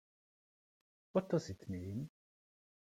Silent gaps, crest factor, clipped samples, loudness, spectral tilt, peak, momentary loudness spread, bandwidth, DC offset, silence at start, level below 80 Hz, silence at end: none; 22 dB; under 0.1%; -41 LUFS; -7.5 dB/octave; -22 dBFS; 10 LU; 15.5 kHz; under 0.1%; 1.15 s; -76 dBFS; 0.85 s